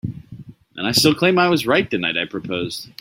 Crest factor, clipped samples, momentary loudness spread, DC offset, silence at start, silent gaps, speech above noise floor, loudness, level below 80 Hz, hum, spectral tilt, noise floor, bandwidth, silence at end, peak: 18 dB; under 0.1%; 15 LU; under 0.1%; 0.05 s; none; 21 dB; -18 LUFS; -54 dBFS; none; -4 dB/octave; -40 dBFS; 16.5 kHz; 0.1 s; -2 dBFS